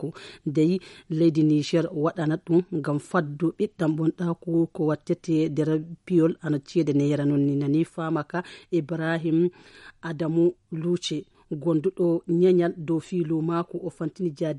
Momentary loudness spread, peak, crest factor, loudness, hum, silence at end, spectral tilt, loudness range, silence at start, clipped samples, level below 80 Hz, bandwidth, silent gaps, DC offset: 8 LU; -10 dBFS; 14 dB; -25 LUFS; none; 0 s; -7.5 dB/octave; 2 LU; 0 s; under 0.1%; -66 dBFS; 11 kHz; none; under 0.1%